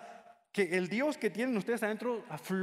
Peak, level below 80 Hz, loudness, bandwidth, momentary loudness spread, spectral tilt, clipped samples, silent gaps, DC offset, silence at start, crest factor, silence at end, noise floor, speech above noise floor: -16 dBFS; -82 dBFS; -34 LUFS; 16 kHz; 8 LU; -5.5 dB/octave; under 0.1%; none; under 0.1%; 0 s; 18 dB; 0 s; -54 dBFS; 21 dB